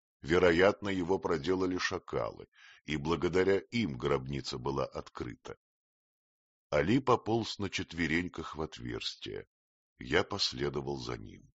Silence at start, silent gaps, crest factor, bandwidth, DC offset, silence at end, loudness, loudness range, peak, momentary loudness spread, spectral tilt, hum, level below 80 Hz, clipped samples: 0.25 s; 2.48-2.52 s, 5.57-6.70 s, 9.47-9.96 s; 22 dB; 8 kHz; under 0.1%; 0.15 s; -32 LUFS; 4 LU; -12 dBFS; 15 LU; -4 dB/octave; none; -56 dBFS; under 0.1%